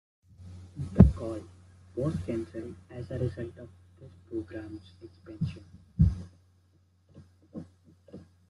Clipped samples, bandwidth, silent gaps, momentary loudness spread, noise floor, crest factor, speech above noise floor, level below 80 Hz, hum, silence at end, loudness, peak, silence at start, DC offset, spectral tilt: under 0.1%; 11 kHz; none; 28 LU; -65 dBFS; 30 dB; 31 dB; -40 dBFS; none; 0.3 s; -30 LUFS; -2 dBFS; 0.4 s; under 0.1%; -10 dB/octave